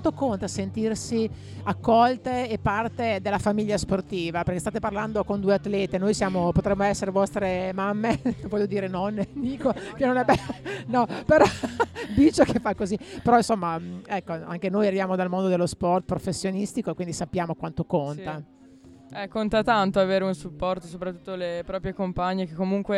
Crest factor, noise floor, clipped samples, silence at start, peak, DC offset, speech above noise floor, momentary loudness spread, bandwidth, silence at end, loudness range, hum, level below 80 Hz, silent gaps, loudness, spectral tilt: 20 dB; -50 dBFS; under 0.1%; 0 s; -4 dBFS; under 0.1%; 25 dB; 10 LU; 12.5 kHz; 0 s; 4 LU; none; -48 dBFS; none; -25 LUFS; -6 dB/octave